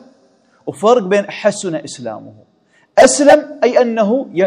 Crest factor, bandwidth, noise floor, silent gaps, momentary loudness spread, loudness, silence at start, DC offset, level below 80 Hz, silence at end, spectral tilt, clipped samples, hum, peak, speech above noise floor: 14 dB; 11.5 kHz; -53 dBFS; none; 18 LU; -13 LUFS; 0.65 s; under 0.1%; -54 dBFS; 0 s; -4 dB/octave; 0.8%; none; 0 dBFS; 40 dB